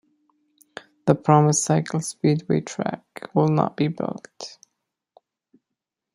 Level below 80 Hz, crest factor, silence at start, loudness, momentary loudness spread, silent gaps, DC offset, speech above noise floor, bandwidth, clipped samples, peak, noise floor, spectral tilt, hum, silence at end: -64 dBFS; 24 dB; 1.05 s; -22 LUFS; 21 LU; none; under 0.1%; 63 dB; 12 kHz; under 0.1%; 0 dBFS; -84 dBFS; -6 dB/octave; none; 1.65 s